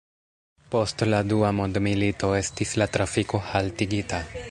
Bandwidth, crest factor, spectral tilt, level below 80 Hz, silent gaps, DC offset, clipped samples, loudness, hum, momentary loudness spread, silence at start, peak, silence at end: 11.5 kHz; 20 dB; -5.5 dB/octave; -44 dBFS; none; under 0.1%; under 0.1%; -25 LUFS; none; 5 LU; 0.7 s; -6 dBFS; 0 s